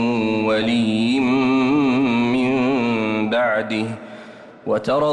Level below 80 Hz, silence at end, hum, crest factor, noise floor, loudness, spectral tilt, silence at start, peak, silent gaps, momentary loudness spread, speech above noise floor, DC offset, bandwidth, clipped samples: -54 dBFS; 0 s; none; 10 dB; -40 dBFS; -19 LUFS; -6.5 dB/octave; 0 s; -10 dBFS; none; 9 LU; 21 dB; under 0.1%; 9.4 kHz; under 0.1%